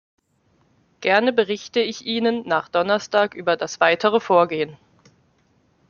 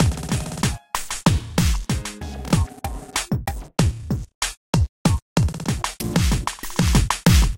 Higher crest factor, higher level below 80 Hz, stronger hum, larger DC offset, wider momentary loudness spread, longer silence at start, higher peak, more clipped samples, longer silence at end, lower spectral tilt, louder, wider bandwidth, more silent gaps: first, 22 dB vs 16 dB; second, -68 dBFS vs -26 dBFS; neither; neither; about the same, 6 LU vs 8 LU; first, 1 s vs 0 s; first, 0 dBFS vs -4 dBFS; neither; first, 1.15 s vs 0 s; about the same, -4 dB/octave vs -5 dB/octave; first, -20 LUFS vs -23 LUFS; second, 7.2 kHz vs 17 kHz; second, none vs 4.34-4.41 s, 4.57-4.73 s, 4.89-5.05 s, 5.22-5.36 s